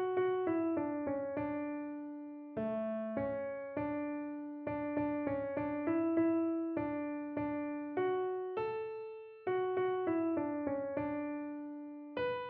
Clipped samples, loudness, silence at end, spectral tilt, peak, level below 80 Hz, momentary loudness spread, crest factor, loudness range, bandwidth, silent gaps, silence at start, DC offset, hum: under 0.1%; -37 LUFS; 0 s; -6 dB/octave; -22 dBFS; -70 dBFS; 10 LU; 16 dB; 3 LU; 4.5 kHz; none; 0 s; under 0.1%; none